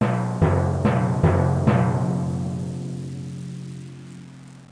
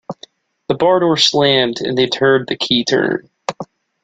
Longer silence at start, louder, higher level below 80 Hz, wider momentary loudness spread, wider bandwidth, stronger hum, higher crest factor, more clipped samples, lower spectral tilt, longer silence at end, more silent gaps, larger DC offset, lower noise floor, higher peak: about the same, 0 s vs 0.1 s; second, -22 LUFS vs -14 LUFS; first, -42 dBFS vs -56 dBFS; about the same, 19 LU vs 19 LU; first, 10.5 kHz vs 9.2 kHz; neither; about the same, 18 dB vs 16 dB; neither; first, -8.5 dB/octave vs -4 dB/octave; second, 0.05 s vs 0.4 s; neither; neither; about the same, -42 dBFS vs -45 dBFS; second, -4 dBFS vs 0 dBFS